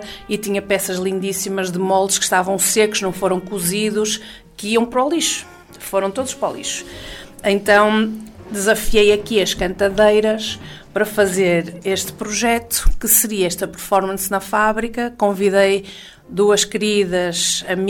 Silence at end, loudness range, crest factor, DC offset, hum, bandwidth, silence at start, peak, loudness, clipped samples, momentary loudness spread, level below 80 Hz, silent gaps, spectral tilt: 0 s; 4 LU; 16 dB; under 0.1%; none; 16.5 kHz; 0 s; -2 dBFS; -18 LUFS; under 0.1%; 11 LU; -32 dBFS; none; -3 dB/octave